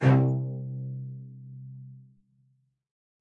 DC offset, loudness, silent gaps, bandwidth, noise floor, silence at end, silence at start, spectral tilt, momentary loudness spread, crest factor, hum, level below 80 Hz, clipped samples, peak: under 0.1%; -29 LUFS; none; 4.4 kHz; -69 dBFS; 1.2 s; 0 s; -9.5 dB/octave; 22 LU; 20 dB; none; -70 dBFS; under 0.1%; -10 dBFS